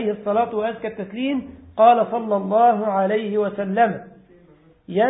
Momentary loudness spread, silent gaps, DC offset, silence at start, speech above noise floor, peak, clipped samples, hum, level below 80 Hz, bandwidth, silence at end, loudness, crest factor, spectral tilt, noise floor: 13 LU; none; under 0.1%; 0 s; 33 dB; -2 dBFS; under 0.1%; none; -58 dBFS; 4 kHz; 0 s; -20 LUFS; 18 dB; -11 dB/octave; -52 dBFS